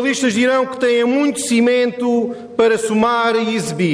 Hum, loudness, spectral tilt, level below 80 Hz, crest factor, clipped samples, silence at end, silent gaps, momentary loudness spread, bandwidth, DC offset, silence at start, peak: none; -16 LUFS; -4.5 dB/octave; -58 dBFS; 12 dB; under 0.1%; 0 s; none; 4 LU; 11 kHz; under 0.1%; 0 s; -4 dBFS